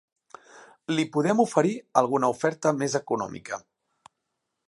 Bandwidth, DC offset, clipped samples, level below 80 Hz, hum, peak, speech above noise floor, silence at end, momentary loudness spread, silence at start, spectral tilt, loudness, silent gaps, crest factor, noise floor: 11.5 kHz; under 0.1%; under 0.1%; -72 dBFS; none; -4 dBFS; 56 dB; 1.1 s; 14 LU; 0.55 s; -5.5 dB/octave; -25 LUFS; none; 22 dB; -81 dBFS